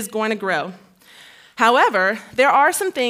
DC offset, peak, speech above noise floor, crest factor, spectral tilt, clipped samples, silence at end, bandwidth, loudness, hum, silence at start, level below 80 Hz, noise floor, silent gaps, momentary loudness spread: under 0.1%; -2 dBFS; 29 dB; 18 dB; -2.5 dB/octave; under 0.1%; 0 s; 16 kHz; -17 LUFS; none; 0 s; -68 dBFS; -47 dBFS; none; 10 LU